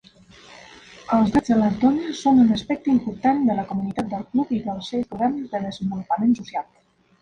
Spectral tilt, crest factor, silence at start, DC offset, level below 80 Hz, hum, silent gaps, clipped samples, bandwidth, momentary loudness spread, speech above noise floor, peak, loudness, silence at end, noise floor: -7 dB/octave; 16 dB; 0.5 s; under 0.1%; -52 dBFS; none; none; under 0.1%; 9 kHz; 10 LU; 28 dB; -6 dBFS; -22 LUFS; 0.6 s; -49 dBFS